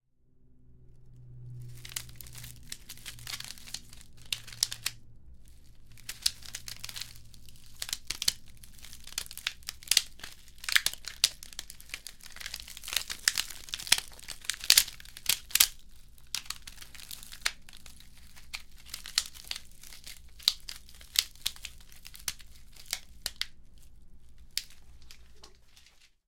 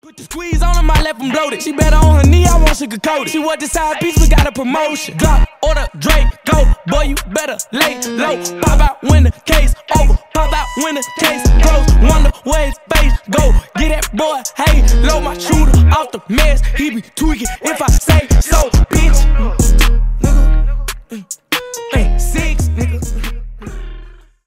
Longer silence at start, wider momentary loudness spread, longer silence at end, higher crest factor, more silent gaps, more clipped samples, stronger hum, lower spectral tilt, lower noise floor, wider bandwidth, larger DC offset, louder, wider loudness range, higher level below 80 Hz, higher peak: first, 0.35 s vs 0.2 s; first, 22 LU vs 8 LU; second, 0.2 s vs 0.35 s; first, 36 dB vs 12 dB; neither; neither; neither; second, 1.5 dB/octave vs -5 dB/octave; first, -61 dBFS vs -35 dBFS; about the same, 17 kHz vs 16 kHz; neither; second, -31 LUFS vs -14 LUFS; first, 14 LU vs 3 LU; second, -54 dBFS vs -12 dBFS; about the same, -2 dBFS vs 0 dBFS